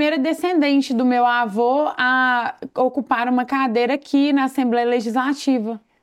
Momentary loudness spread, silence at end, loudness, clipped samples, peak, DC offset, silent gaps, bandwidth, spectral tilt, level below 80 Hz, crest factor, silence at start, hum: 4 LU; 0.25 s; -19 LUFS; under 0.1%; -4 dBFS; under 0.1%; none; 13 kHz; -4.5 dB/octave; -70 dBFS; 14 dB; 0 s; none